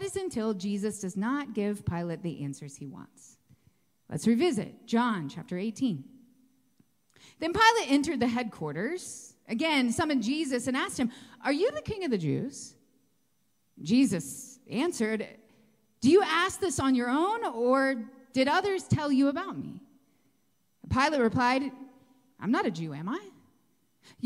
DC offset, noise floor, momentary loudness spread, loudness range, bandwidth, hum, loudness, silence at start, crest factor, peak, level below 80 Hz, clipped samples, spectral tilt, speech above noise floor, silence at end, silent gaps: under 0.1%; -75 dBFS; 14 LU; 6 LU; 15.5 kHz; none; -29 LUFS; 0 s; 22 dB; -8 dBFS; -60 dBFS; under 0.1%; -5 dB/octave; 46 dB; 0 s; none